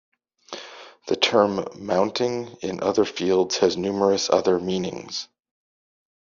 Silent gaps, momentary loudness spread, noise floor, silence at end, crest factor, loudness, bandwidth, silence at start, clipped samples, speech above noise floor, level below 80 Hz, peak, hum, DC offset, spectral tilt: none; 18 LU; -43 dBFS; 1 s; 20 dB; -23 LUFS; 7.4 kHz; 0.5 s; under 0.1%; 20 dB; -64 dBFS; -4 dBFS; none; under 0.1%; -3.5 dB/octave